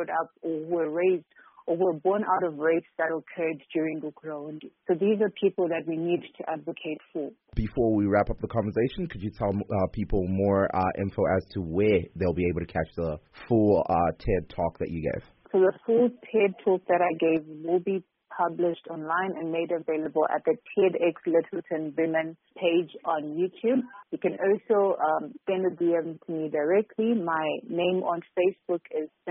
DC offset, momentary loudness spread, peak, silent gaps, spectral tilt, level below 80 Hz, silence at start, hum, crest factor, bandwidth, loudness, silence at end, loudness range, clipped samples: under 0.1%; 10 LU; -10 dBFS; none; -6 dB/octave; -48 dBFS; 0 s; none; 16 dB; 5.6 kHz; -27 LUFS; 0 s; 3 LU; under 0.1%